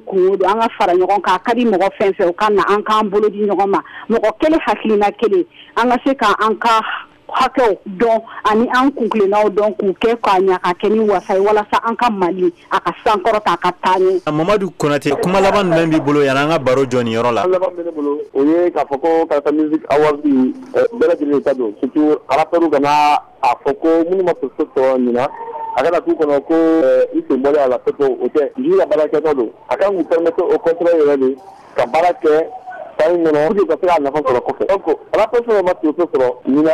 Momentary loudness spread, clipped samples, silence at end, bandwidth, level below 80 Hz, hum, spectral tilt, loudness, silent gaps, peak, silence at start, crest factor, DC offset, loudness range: 4 LU; under 0.1%; 0 s; 13.5 kHz; -50 dBFS; none; -6 dB/octave; -15 LUFS; none; -4 dBFS; 0.05 s; 10 dB; under 0.1%; 1 LU